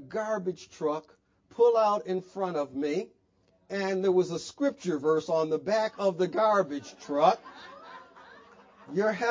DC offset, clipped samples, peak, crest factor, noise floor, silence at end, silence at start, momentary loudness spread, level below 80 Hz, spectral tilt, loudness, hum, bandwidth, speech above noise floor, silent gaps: under 0.1%; under 0.1%; -8 dBFS; 20 dB; -68 dBFS; 0 s; 0 s; 15 LU; -74 dBFS; -5.5 dB/octave; -28 LUFS; none; 7.6 kHz; 40 dB; none